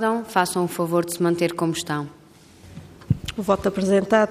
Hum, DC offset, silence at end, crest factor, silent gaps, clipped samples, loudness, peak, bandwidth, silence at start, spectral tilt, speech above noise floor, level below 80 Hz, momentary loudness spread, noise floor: none; under 0.1%; 0 s; 18 dB; none; under 0.1%; -23 LUFS; -6 dBFS; 15.5 kHz; 0 s; -5.5 dB/octave; 27 dB; -50 dBFS; 13 LU; -48 dBFS